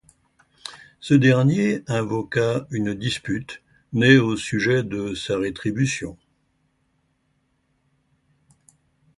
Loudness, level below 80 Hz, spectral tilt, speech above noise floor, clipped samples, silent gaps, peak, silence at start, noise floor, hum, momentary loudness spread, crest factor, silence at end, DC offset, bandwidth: -21 LUFS; -54 dBFS; -6 dB/octave; 48 dB; under 0.1%; none; -2 dBFS; 0.65 s; -69 dBFS; none; 23 LU; 20 dB; 3.05 s; under 0.1%; 11.5 kHz